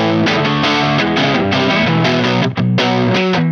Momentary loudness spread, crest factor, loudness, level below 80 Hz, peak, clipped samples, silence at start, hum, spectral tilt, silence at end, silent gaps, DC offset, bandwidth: 2 LU; 12 dB; -13 LUFS; -46 dBFS; -2 dBFS; under 0.1%; 0 s; none; -6 dB/octave; 0 s; none; under 0.1%; 7.4 kHz